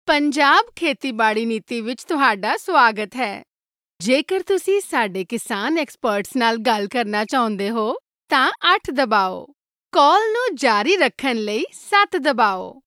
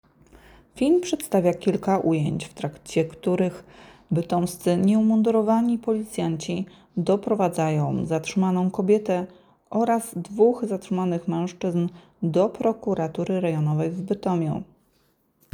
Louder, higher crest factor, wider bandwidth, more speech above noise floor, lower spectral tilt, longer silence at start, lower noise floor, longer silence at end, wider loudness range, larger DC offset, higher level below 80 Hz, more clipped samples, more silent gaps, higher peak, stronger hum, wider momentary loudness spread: first, -19 LUFS vs -24 LUFS; about the same, 18 dB vs 16 dB; second, 16 kHz vs over 20 kHz; first, over 71 dB vs 42 dB; second, -3.5 dB/octave vs -7 dB/octave; second, 0.05 s vs 0.75 s; first, under -90 dBFS vs -66 dBFS; second, 0.15 s vs 0.9 s; about the same, 3 LU vs 3 LU; neither; about the same, -62 dBFS vs -60 dBFS; neither; neither; first, -2 dBFS vs -6 dBFS; neither; about the same, 10 LU vs 8 LU